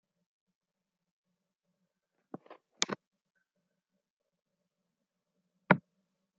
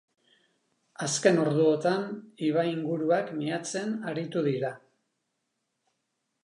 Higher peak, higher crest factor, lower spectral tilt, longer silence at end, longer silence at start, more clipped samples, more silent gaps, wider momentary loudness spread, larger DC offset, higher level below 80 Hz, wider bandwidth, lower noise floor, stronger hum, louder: about the same, -6 dBFS vs -8 dBFS; first, 34 dB vs 22 dB; second, -3.5 dB/octave vs -5 dB/octave; second, 0.6 s vs 1.65 s; first, 2.5 s vs 1 s; neither; first, 3.07-3.11 s, 4.10-4.17 s vs none; first, 22 LU vs 9 LU; neither; about the same, -86 dBFS vs -82 dBFS; second, 7 kHz vs 11.5 kHz; first, -89 dBFS vs -80 dBFS; neither; second, -32 LUFS vs -28 LUFS